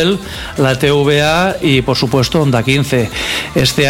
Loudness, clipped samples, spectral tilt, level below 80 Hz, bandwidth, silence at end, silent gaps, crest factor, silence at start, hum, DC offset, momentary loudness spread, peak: -13 LUFS; under 0.1%; -5 dB/octave; -34 dBFS; 16.5 kHz; 0 s; none; 12 dB; 0 s; none; under 0.1%; 5 LU; 0 dBFS